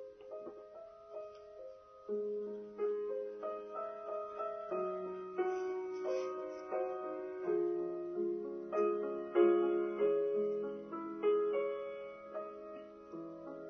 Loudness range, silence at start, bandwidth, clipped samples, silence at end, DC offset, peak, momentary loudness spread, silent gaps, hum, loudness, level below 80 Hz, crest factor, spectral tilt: 8 LU; 0 s; 6.4 kHz; under 0.1%; 0 s; under 0.1%; -18 dBFS; 17 LU; none; none; -38 LUFS; -80 dBFS; 20 dB; -5.5 dB/octave